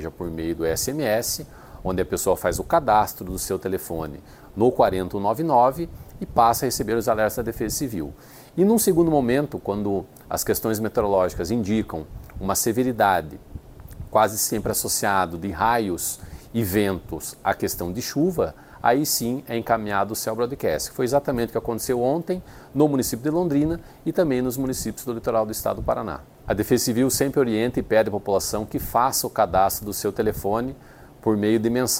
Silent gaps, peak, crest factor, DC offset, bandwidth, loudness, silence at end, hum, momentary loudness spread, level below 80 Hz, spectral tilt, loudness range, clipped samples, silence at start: none; -4 dBFS; 20 dB; under 0.1%; 16.5 kHz; -23 LUFS; 0 s; none; 11 LU; -44 dBFS; -4.5 dB/octave; 3 LU; under 0.1%; 0 s